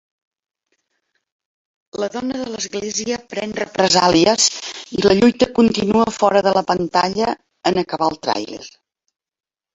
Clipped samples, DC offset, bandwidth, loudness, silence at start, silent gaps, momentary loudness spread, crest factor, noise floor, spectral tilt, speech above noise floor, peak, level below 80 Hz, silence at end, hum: under 0.1%; under 0.1%; 8.2 kHz; -17 LUFS; 1.95 s; none; 12 LU; 18 dB; -71 dBFS; -3.5 dB/octave; 54 dB; 0 dBFS; -50 dBFS; 1.05 s; none